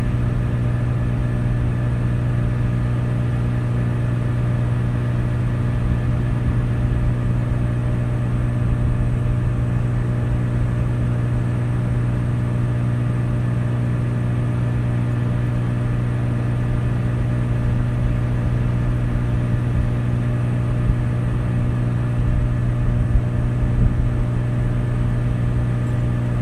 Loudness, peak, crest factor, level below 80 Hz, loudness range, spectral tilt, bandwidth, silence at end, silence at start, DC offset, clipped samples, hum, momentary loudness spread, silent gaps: -21 LUFS; -4 dBFS; 16 dB; -26 dBFS; 1 LU; -9 dB/octave; 9.4 kHz; 0 s; 0 s; under 0.1%; under 0.1%; 60 Hz at -20 dBFS; 1 LU; none